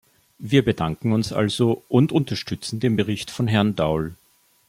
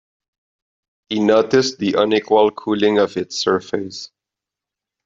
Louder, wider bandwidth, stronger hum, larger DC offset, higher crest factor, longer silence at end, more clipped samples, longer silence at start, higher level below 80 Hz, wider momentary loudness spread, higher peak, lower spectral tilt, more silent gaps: second, -22 LUFS vs -17 LUFS; first, 16 kHz vs 7.6 kHz; neither; neither; about the same, 20 dB vs 16 dB; second, 0.55 s vs 1 s; neither; second, 0.4 s vs 1.1 s; first, -50 dBFS vs -62 dBFS; second, 8 LU vs 11 LU; about the same, -2 dBFS vs -2 dBFS; first, -6.5 dB/octave vs -4.5 dB/octave; neither